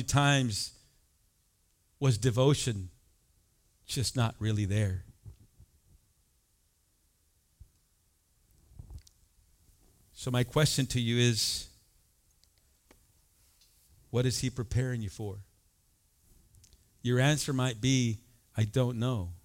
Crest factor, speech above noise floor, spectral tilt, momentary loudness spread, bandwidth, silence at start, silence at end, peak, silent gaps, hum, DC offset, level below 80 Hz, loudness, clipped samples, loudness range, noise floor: 22 dB; 42 dB; -5 dB/octave; 15 LU; 16.5 kHz; 0 s; 0.05 s; -10 dBFS; none; none; under 0.1%; -54 dBFS; -30 LUFS; under 0.1%; 6 LU; -71 dBFS